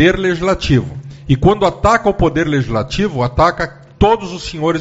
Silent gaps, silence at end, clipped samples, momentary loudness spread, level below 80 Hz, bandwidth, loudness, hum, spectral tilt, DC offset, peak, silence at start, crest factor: none; 0 s; under 0.1%; 9 LU; -28 dBFS; 8 kHz; -15 LUFS; none; -6.5 dB/octave; under 0.1%; 0 dBFS; 0 s; 14 dB